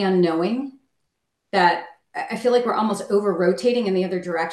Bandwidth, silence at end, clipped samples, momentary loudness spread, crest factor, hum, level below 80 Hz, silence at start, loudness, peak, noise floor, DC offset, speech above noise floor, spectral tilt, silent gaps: 12.5 kHz; 0 s; under 0.1%; 10 LU; 18 dB; none; -70 dBFS; 0 s; -21 LUFS; -4 dBFS; -76 dBFS; under 0.1%; 56 dB; -6 dB/octave; none